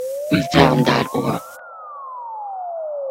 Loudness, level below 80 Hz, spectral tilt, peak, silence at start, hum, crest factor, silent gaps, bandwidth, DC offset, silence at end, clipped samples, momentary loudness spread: -19 LUFS; -46 dBFS; -6 dB/octave; 0 dBFS; 0 s; none; 20 dB; none; 16 kHz; under 0.1%; 0 s; under 0.1%; 20 LU